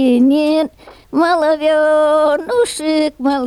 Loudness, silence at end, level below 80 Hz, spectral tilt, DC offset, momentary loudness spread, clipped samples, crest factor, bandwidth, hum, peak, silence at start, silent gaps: -14 LUFS; 0 s; -52 dBFS; -3.5 dB/octave; under 0.1%; 5 LU; under 0.1%; 10 dB; 13 kHz; none; -4 dBFS; 0 s; none